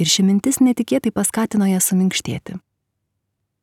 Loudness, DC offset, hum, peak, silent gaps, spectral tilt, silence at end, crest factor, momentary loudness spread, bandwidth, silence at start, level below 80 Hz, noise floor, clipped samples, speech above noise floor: -18 LUFS; under 0.1%; none; -4 dBFS; none; -4 dB/octave; 1.05 s; 16 dB; 13 LU; 17.5 kHz; 0 s; -56 dBFS; -75 dBFS; under 0.1%; 57 dB